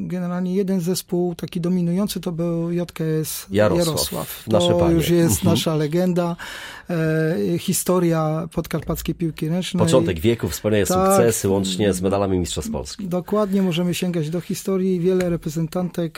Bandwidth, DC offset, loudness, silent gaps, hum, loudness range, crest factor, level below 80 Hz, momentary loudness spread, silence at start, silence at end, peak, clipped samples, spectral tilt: 17 kHz; under 0.1%; -21 LUFS; none; none; 3 LU; 18 dB; -42 dBFS; 9 LU; 0 s; 0.1 s; -4 dBFS; under 0.1%; -5.5 dB/octave